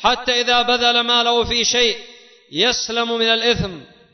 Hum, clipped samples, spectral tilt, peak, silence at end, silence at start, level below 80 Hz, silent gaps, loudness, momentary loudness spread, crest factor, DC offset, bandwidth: none; under 0.1%; -2 dB/octave; -2 dBFS; 0.3 s; 0 s; -44 dBFS; none; -16 LUFS; 7 LU; 16 dB; under 0.1%; 6.4 kHz